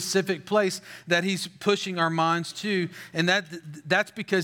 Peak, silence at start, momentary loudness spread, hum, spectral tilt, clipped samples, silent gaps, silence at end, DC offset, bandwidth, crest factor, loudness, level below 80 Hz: -8 dBFS; 0 s; 5 LU; none; -4 dB/octave; under 0.1%; none; 0 s; under 0.1%; 18 kHz; 18 dB; -26 LUFS; -78 dBFS